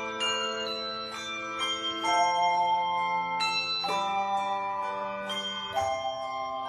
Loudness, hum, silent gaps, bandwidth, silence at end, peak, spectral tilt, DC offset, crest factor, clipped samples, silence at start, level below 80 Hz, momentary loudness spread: -29 LUFS; none; none; 13 kHz; 0 s; -14 dBFS; -1.5 dB/octave; under 0.1%; 16 dB; under 0.1%; 0 s; -66 dBFS; 8 LU